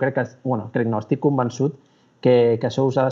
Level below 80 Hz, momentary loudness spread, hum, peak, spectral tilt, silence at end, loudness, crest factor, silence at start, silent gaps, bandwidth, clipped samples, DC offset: -72 dBFS; 9 LU; none; -4 dBFS; -7.5 dB/octave; 0 s; -21 LUFS; 16 dB; 0 s; none; 7.4 kHz; under 0.1%; under 0.1%